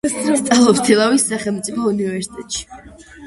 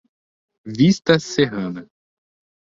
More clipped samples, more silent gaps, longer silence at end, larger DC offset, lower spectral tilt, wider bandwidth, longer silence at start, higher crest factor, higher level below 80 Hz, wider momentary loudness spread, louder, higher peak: neither; neither; second, 0 s vs 0.95 s; neither; second, -3.5 dB/octave vs -5.5 dB/octave; first, 12 kHz vs 7.8 kHz; second, 0.05 s vs 0.65 s; about the same, 16 dB vs 20 dB; first, -50 dBFS vs -56 dBFS; about the same, 14 LU vs 16 LU; about the same, -16 LUFS vs -18 LUFS; about the same, 0 dBFS vs -2 dBFS